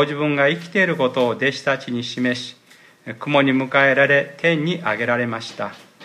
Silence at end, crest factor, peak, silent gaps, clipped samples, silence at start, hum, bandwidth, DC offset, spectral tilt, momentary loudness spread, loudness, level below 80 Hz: 0 s; 18 dB; -2 dBFS; none; under 0.1%; 0 s; none; 13 kHz; under 0.1%; -5.5 dB/octave; 14 LU; -19 LUFS; -68 dBFS